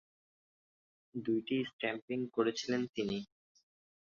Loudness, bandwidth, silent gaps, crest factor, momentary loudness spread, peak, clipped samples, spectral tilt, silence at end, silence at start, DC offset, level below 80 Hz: -37 LUFS; 7.4 kHz; 1.73-1.79 s, 2.02-2.08 s, 2.89-2.94 s; 22 dB; 8 LU; -18 dBFS; under 0.1%; -4 dB/octave; 0.9 s; 1.15 s; under 0.1%; -74 dBFS